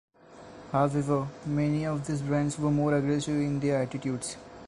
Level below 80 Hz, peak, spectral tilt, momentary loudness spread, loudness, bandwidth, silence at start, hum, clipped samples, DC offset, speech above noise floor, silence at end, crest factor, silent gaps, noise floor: -56 dBFS; -12 dBFS; -6.5 dB/octave; 7 LU; -29 LUFS; 11 kHz; 0.3 s; none; under 0.1%; under 0.1%; 22 dB; 0 s; 16 dB; none; -49 dBFS